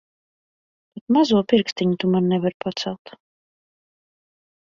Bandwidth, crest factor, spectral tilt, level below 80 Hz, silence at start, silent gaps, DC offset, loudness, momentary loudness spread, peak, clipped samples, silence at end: 7.6 kHz; 20 dB; -6.5 dB/octave; -62 dBFS; 0.95 s; 1.01-1.07 s, 1.72-1.76 s, 2.54-2.60 s; under 0.1%; -21 LUFS; 12 LU; -4 dBFS; under 0.1%; 1.7 s